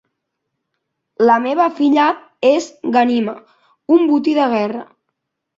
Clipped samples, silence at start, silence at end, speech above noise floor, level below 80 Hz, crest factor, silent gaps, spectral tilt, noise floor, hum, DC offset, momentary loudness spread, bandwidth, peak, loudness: under 0.1%; 1.2 s; 0.75 s; 61 dB; -66 dBFS; 16 dB; none; -5 dB/octave; -75 dBFS; none; under 0.1%; 11 LU; 7.8 kHz; -2 dBFS; -15 LUFS